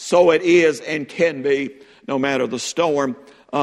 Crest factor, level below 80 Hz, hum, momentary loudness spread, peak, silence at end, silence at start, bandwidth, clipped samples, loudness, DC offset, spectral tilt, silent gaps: 18 dB; -62 dBFS; none; 12 LU; -2 dBFS; 0 s; 0 s; 12 kHz; under 0.1%; -19 LUFS; under 0.1%; -4.5 dB/octave; none